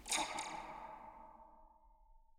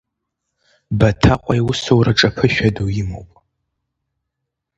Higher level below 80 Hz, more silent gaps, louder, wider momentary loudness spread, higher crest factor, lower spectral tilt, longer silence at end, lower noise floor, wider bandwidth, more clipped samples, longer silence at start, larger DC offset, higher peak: second, -66 dBFS vs -34 dBFS; neither; second, -43 LUFS vs -16 LUFS; first, 23 LU vs 11 LU; about the same, 22 dB vs 18 dB; second, 0 dB/octave vs -6 dB/octave; second, 0 s vs 1.5 s; second, -65 dBFS vs -79 dBFS; first, over 20 kHz vs 8 kHz; neither; second, 0 s vs 0.9 s; neither; second, -24 dBFS vs 0 dBFS